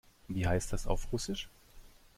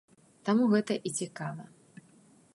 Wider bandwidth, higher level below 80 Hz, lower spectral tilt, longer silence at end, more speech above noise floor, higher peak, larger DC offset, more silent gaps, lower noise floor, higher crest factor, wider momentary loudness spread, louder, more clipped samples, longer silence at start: first, 16 kHz vs 11.5 kHz; first, -42 dBFS vs -80 dBFS; about the same, -5 dB/octave vs -5.5 dB/octave; second, 0.3 s vs 0.9 s; second, 22 dB vs 31 dB; about the same, -16 dBFS vs -14 dBFS; neither; neither; second, -55 dBFS vs -61 dBFS; about the same, 20 dB vs 18 dB; second, 8 LU vs 17 LU; second, -36 LUFS vs -30 LUFS; neither; second, 0.25 s vs 0.45 s